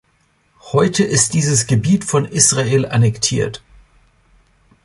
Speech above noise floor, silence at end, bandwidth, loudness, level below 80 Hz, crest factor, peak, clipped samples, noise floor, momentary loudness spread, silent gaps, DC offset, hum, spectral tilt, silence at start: 44 dB; 1.3 s; 11.5 kHz; -15 LUFS; -46 dBFS; 18 dB; 0 dBFS; under 0.1%; -60 dBFS; 8 LU; none; under 0.1%; none; -4 dB/octave; 0.65 s